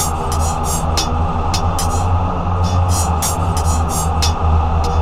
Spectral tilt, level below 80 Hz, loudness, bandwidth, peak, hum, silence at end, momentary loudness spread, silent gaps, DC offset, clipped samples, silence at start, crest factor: -4.5 dB/octave; -20 dBFS; -17 LUFS; 16 kHz; -2 dBFS; none; 0 s; 3 LU; none; under 0.1%; under 0.1%; 0 s; 12 dB